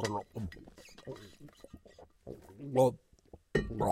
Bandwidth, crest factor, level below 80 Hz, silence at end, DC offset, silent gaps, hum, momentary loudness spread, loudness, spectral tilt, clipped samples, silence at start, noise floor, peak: 15.5 kHz; 22 dB; -54 dBFS; 0 s; under 0.1%; none; none; 26 LU; -34 LUFS; -6 dB/octave; under 0.1%; 0 s; -59 dBFS; -16 dBFS